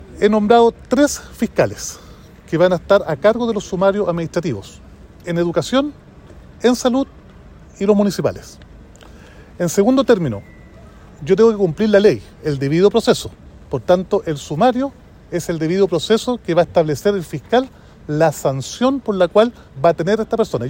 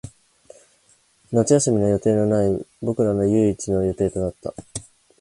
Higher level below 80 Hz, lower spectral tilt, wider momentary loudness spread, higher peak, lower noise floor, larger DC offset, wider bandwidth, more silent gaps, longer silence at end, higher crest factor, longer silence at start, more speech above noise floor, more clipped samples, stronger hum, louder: about the same, -44 dBFS vs -46 dBFS; about the same, -5.5 dB/octave vs -6.5 dB/octave; second, 12 LU vs 15 LU; first, 0 dBFS vs -4 dBFS; second, -41 dBFS vs -59 dBFS; neither; first, 16.5 kHz vs 11.5 kHz; neither; second, 0 s vs 0.4 s; about the same, 16 dB vs 18 dB; about the same, 0 s vs 0.05 s; second, 25 dB vs 40 dB; neither; neither; first, -17 LUFS vs -21 LUFS